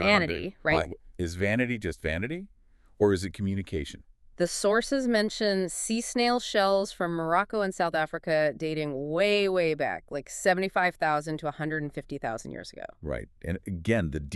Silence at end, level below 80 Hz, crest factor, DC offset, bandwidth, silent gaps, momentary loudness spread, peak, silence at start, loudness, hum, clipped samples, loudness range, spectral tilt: 0 s; -50 dBFS; 20 dB; under 0.1%; 13.5 kHz; none; 11 LU; -8 dBFS; 0 s; -28 LUFS; none; under 0.1%; 4 LU; -4.5 dB/octave